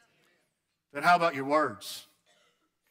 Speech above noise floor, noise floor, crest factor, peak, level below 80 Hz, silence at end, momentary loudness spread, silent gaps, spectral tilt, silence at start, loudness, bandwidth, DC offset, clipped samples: 52 dB; -79 dBFS; 18 dB; -14 dBFS; -78 dBFS; 0.9 s; 18 LU; none; -4.5 dB/octave; 0.95 s; -27 LUFS; 16 kHz; under 0.1%; under 0.1%